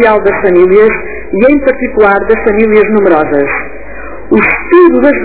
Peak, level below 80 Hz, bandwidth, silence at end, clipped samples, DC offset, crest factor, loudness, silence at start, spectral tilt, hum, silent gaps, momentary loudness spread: 0 dBFS; -32 dBFS; 4 kHz; 0 s; 4%; 7%; 8 dB; -8 LUFS; 0 s; -10.5 dB/octave; none; none; 11 LU